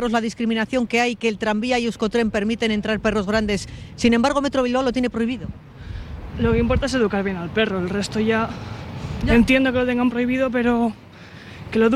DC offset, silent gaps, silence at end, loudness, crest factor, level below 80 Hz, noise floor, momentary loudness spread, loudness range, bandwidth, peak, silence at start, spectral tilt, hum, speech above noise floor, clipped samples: under 0.1%; none; 0 s; -21 LUFS; 16 dB; -36 dBFS; -40 dBFS; 16 LU; 2 LU; 12 kHz; -4 dBFS; 0 s; -5.5 dB/octave; none; 20 dB; under 0.1%